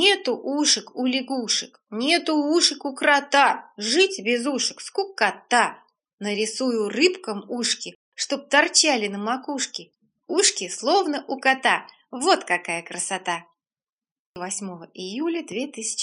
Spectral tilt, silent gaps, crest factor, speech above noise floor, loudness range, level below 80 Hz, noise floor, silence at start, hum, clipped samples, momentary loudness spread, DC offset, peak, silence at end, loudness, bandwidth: -1.5 dB/octave; 6.13-6.18 s, 7.95-8.12 s, 13.92-13.98 s, 14.11-14.34 s; 20 dB; over 67 dB; 6 LU; -80 dBFS; under -90 dBFS; 0 s; none; under 0.1%; 12 LU; under 0.1%; -4 dBFS; 0 s; -22 LUFS; 11.5 kHz